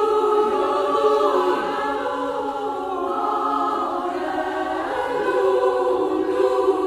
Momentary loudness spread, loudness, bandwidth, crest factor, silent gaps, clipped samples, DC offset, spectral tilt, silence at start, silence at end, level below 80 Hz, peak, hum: 6 LU; -21 LUFS; 13.5 kHz; 14 dB; none; under 0.1%; under 0.1%; -4.5 dB/octave; 0 s; 0 s; -56 dBFS; -6 dBFS; none